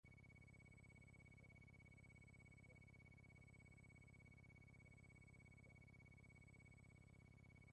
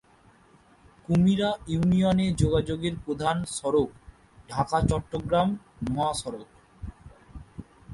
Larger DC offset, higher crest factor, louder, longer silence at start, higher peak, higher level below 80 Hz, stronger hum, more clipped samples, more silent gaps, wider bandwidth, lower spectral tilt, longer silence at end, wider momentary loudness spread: neither; second, 12 dB vs 20 dB; second, -67 LUFS vs -26 LUFS; second, 0.05 s vs 1.1 s; second, -56 dBFS vs -8 dBFS; second, -74 dBFS vs -44 dBFS; first, 50 Hz at -75 dBFS vs none; neither; neither; second, 9.6 kHz vs 11.5 kHz; about the same, -6 dB/octave vs -6.5 dB/octave; about the same, 0 s vs 0 s; second, 1 LU vs 21 LU